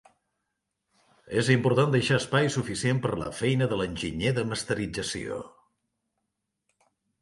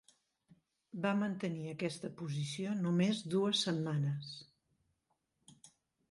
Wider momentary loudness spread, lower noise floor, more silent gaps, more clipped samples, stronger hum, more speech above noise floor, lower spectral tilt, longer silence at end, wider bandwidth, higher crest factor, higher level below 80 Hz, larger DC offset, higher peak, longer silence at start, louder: about the same, 9 LU vs 11 LU; about the same, -82 dBFS vs -82 dBFS; neither; neither; neither; first, 56 dB vs 47 dB; about the same, -5.5 dB/octave vs -5.5 dB/octave; first, 1.75 s vs 0.45 s; about the same, 11.5 kHz vs 11.5 kHz; about the same, 22 dB vs 18 dB; first, -54 dBFS vs -80 dBFS; neither; first, -8 dBFS vs -20 dBFS; first, 1.25 s vs 0.95 s; first, -27 LUFS vs -36 LUFS